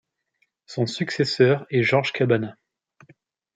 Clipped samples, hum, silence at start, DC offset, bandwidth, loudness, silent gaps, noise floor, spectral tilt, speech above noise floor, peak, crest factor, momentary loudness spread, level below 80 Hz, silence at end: under 0.1%; none; 0.7 s; under 0.1%; 9.2 kHz; -22 LUFS; none; -71 dBFS; -6 dB/octave; 50 dB; -4 dBFS; 20 dB; 9 LU; -68 dBFS; 1.05 s